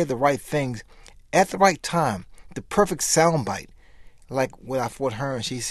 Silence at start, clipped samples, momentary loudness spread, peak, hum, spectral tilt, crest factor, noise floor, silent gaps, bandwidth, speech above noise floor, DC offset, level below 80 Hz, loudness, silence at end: 0 s; under 0.1%; 13 LU; -2 dBFS; none; -4 dB/octave; 22 dB; -47 dBFS; none; 13 kHz; 24 dB; under 0.1%; -50 dBFS; -23 LUFS; 0 s